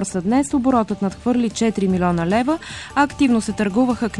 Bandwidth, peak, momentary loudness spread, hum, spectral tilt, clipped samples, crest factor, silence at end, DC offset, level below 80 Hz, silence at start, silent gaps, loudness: 11.5 kHz; -6 dBFS; 5 LU; none; -6 dB/octave; under 0.1%; 14 dB; 0 s; 0.1%; -42 dBFS; 0 s; none; -19 LUFS